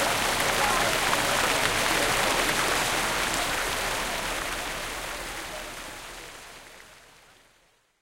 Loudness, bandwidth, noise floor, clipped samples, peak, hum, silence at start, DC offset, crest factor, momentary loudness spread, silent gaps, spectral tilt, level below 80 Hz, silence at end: -25 LUFS; 16 kHz; -64 dBFS; under 0.1%; -8 dBFS; none; 0 s; under 0.1%; 20 dB; 16 LU; none; -1.5 dB/octave; -46 dBFS; 1.05 s